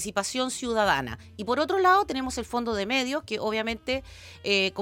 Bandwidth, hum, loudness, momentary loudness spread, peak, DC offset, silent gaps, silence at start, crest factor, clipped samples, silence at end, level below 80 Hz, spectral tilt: 17 kHz; none; -26 LUFS; 10 LU; -8 dBFS; under 0.1%; none; 0 s; 18 dB; under 0.1%; 0 s; -52 dBFS; -3 dB/octave